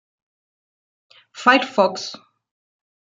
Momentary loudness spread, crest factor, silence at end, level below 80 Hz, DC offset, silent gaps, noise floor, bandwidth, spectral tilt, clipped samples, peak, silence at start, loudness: 15 LU; 22 dB; 0.95 s; -76 dBFS; under 0.1%; none; under -90 dBFS; 9 kHz; -3.5 dB/octave; under 0.1%; -2 dBFS; 1.35 s; -18 LUFS